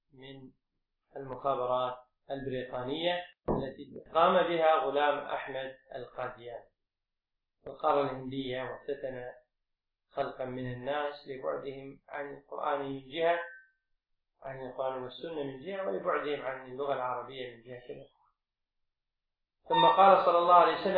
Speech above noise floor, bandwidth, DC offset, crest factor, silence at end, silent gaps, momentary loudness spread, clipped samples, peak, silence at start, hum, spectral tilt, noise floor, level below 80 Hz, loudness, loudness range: 57 dB; 5 kHz; under 0.1%; 24 dB; 0 s; none; 22 LU; under 0.1%; -8 dBFS; 0.2 s; none; -8 dB/octave; -88 dBFS; -62 dBFS; -31 LUFS; 8 LU